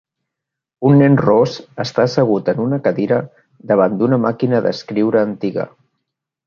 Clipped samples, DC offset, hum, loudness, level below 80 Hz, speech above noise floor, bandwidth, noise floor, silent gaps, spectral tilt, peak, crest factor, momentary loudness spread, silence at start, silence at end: under 0.1%; under 0.1%; none; -16 LUFS; -56 dBFS; 66 dB; 7 kHz; -81 dBFS; none; -8 dB/octave; 0 dBFS; 16 dB; 10 LU; 0.8 s; 0.8 s